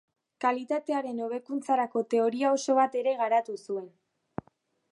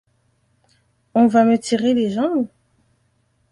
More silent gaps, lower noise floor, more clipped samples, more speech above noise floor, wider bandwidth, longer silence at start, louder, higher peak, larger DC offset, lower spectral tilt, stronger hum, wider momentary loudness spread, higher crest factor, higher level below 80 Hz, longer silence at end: neither; first, -68 dBFS vs -64 dBFS; neither; second, 41 dB vs 48 dB; about the same, 11.5 kHz vs 11 kHz; second, 0.4 s vs 1.15 s; second, -28 LUFS vs -18 LUFS; second, -12 dBFS vs -4 dBFS; neither; second, -4.5 dB/octave vs -6 dB/octave; neither; about the same, 12 LU vs 10 LU; about the same, 18 dB vs 18 dB; second, -74 dBFS vs -62 dBFS; about the same, 1.05 s vs 1.05 s